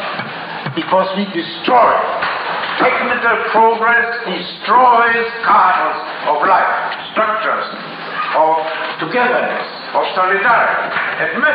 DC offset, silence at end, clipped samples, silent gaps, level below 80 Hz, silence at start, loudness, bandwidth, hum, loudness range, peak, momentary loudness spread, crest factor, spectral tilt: under 0.1%; 0 s; under 0.1%; none; -60 dBFS; 0 s; -14 LUFS; 5.4 kHz; none; 4 LU; -2 dBFS; 10 LU; 12 dB; -7 dB/octave